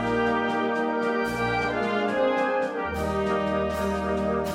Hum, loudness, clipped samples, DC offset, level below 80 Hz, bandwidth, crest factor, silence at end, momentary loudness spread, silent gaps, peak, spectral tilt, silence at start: none; -25 LUFS; under 0.1%; under 0.1%; -44 dBFS; 16 kHz; 12 dB; 0 s; 3 LU; none; -12 dBFS; -6 dB/octave; 0 s